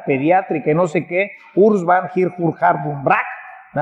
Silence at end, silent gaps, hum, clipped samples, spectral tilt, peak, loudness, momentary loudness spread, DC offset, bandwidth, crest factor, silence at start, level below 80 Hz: 0 s; none; none; under 0.1%; -8 dB/octave; -2 dBFS; -17 LUFS; 7 LU; under 0.1%; 8.4 kHz; 16 dB; 0 s; -64 dBFS